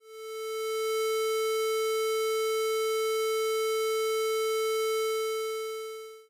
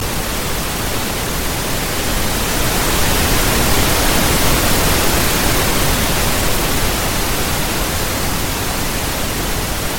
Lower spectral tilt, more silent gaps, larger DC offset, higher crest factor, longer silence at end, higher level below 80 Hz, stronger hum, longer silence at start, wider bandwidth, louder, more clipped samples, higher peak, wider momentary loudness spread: second, 1.5 dB/octave vs -3 dB/octave; neither; neither; second, 4 dB vs 16 dB; about the same, 0.05 s vs 0 s; second, -72 dBFS vs -22 dBFS; neither; about the same, 0.05 s vs 0 s; about the same, 16 kHz vs 17 kHz; second, -29 LUFS vs -16 LUFS; neither; second, -26 dBFS vs 0 dBFS; about the same, 7 LU vs 5 LU